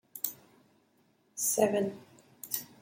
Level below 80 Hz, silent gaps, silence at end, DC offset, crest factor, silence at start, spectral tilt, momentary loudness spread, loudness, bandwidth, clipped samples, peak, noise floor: -80 dBFS; none; 0.15 s; under 0.1%; 22 dB; 0.15 s; -3.5 dB/octave; 22 LU; -32 LUFS; 16.5 kHz; under 0.1%; -12 dBFS; -69 dBFS